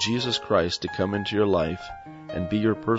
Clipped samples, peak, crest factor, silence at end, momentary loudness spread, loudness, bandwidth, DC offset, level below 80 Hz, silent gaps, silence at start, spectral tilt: under 0.1%; -8 dBFS; 18 dB; 0 s; 12 LU; -25 LUFS; 8 kHz; under 0.1%; -50 dBFS; none; 0 s; -5 dB/octave